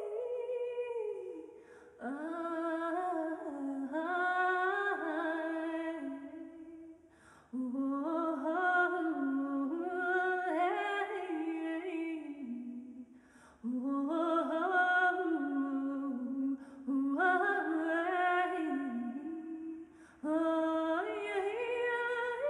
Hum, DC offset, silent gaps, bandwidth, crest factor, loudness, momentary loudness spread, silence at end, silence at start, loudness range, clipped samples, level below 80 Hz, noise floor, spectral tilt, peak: none; under 0.1%; none; 10.5 kHz; 16 dB; -35 LUFS; 13 LU; 0 s; 0 s; 6 LU; under 0.1%; -80 dBFS; -61 dBFS; -4.5 dB/octave; -18 dBFS